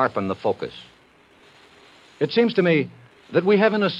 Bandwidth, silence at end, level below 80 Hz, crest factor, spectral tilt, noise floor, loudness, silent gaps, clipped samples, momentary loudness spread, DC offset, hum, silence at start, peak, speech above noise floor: 7.8 kHz; 0 s; -68 dBFS; 20 dB; -7.5 dB/octave; -54 dBFS; -21 LUFS; none; under 0.1%; 15 LU; under 0.1%; none; 0 s; -4 dBFS; 34 dB